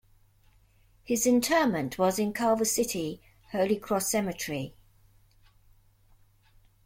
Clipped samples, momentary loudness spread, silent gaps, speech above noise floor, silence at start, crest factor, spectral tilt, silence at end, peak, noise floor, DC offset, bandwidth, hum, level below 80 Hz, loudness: under 0.1%; 13 LU; none; 35 dB; 1.1 s; 18 dB; -4 dB/octave; 2.15 s; -12 dBFS; -62 dBFS; under 0.1%; 16.5 kHz; none; -60 dBFS; -28 LUFS